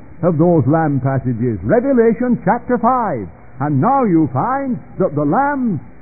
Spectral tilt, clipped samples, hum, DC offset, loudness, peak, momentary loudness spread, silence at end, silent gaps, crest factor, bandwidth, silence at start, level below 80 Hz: -16.5 dB/octave; under 0.1%; none; 1%; -16 LUFS; -2 dBFS; 8 LU; 0.1 s; none; 14 dB; 2.6 kHz; 0.1 s; -44 dBFS